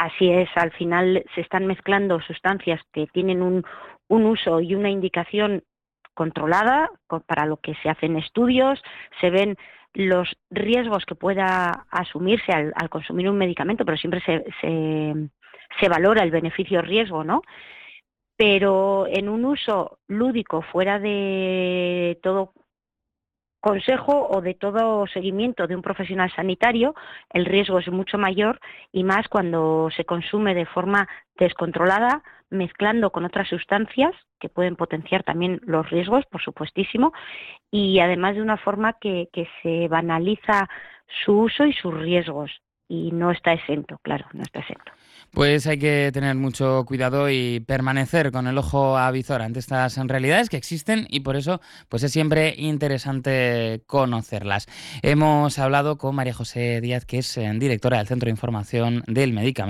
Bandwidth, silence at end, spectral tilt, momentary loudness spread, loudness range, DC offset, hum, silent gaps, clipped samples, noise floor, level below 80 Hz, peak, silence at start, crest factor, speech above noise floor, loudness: 14 kHz; 0 s; -6 dB/octave; 9 LU; 2 LU; under 0.1%; none; none; under 0.1%; -87 dBFS; -52 dBFS; -6 dBFS; 0 s; 16 dB; 65 dB; -22 LUFS